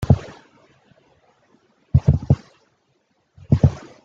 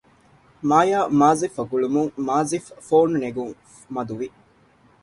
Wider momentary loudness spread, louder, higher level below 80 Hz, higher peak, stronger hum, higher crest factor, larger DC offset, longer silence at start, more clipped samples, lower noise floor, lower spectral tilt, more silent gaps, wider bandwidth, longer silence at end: second, 4 LU vs 14 LU; about the same, -20 LUFS vs -21 LUFS; first, -36 dBFS vs -62 dBFS; about the same, -2 dBFS vs -2 dBFS; neither; about the same, 20 dB vs 20 dB; neither; second, 0 s vs 0.65 s; neither; first, -66 dBFS vs -56 dBFS; first, -9.5 dB/octave vs -6 dB/octave; neither; second, 7.2 kHz vs 11.5 kHz; second, 0.25 s vs 0.75 s